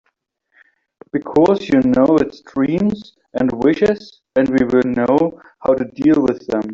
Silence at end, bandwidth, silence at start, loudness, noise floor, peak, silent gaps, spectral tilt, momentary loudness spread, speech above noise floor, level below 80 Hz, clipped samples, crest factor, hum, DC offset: 0 s; 7.4 kHz; 1.15 s; -16 LUFS; -68 dBFS; -2 dBFS; none; -8 dB/octave; 9 LU; 53 dB; -48 dBFS; under 0.1%; 14 dB; none; under 0.1%